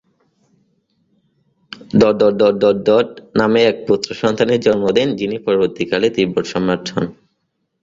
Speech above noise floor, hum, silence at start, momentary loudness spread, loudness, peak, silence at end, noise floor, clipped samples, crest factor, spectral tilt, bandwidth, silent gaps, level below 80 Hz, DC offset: 55 dB; none; 1.95 s; 7 LU; -16 LUFS; 0 dBFS; 0.7 s; -70 dBFS; under 0.1%; 16 dB; -6 dB/octave; 7.8 kHz; none; -52 dBFS; under 0.1%